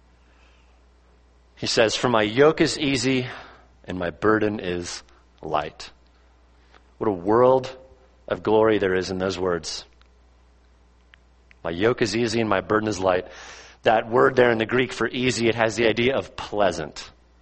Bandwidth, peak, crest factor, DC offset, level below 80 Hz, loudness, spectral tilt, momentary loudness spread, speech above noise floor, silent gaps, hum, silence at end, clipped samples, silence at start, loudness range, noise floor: 8.8 kHz; -2 dBFS; 22 dB; under 0.1%; -52 dBFS; -22 LUFS; -4.5 dB/octave; 17 LU; 34 dB; none; none; 0.35 s; under 0.1%; 1.6 s; 6 LU; -56 dBFS